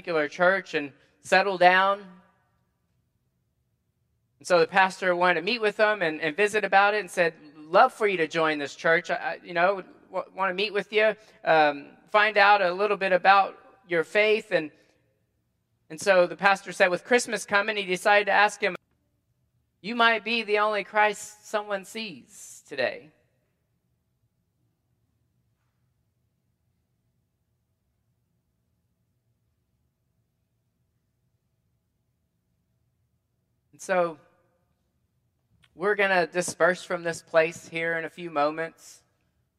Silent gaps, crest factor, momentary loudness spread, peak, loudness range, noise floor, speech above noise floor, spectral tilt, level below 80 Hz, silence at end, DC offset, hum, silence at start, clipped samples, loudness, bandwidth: none; 24 dB; 14 LU; -2 dBFS; 13 LU; -75 dBFS; 50 dB; -3.5 dB/octave; -78 dBFS; 0.9 s; under 0.1%; none; 0.05 s; under 0.1%; -24 LUFS; 14.5 kHz